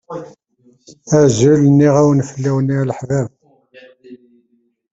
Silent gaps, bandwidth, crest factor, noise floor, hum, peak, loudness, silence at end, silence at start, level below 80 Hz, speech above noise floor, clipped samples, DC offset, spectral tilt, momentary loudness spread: none; 8 kHz; 16 dB; -60 dBFS; none; 0 dBFS; -14 LUFS; 0.75 s; 0.1 s; -50 dBFS; 46 dB; under 0.1%; under 0.1%; -7 dB/octave; 13 LU